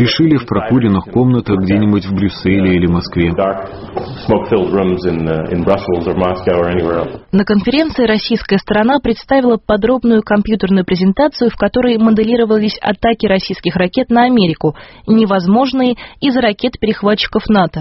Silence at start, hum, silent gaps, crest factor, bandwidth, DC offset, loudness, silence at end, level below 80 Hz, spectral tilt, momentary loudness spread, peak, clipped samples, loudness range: 0 s; none; none; 12 dB; 6 kHz; under 0.1%; -13 LUFS; 0 s; -36 dBFS; -5.5 dB/octave; 5 LU; 0 dBFS; under 0.1%; 2 LU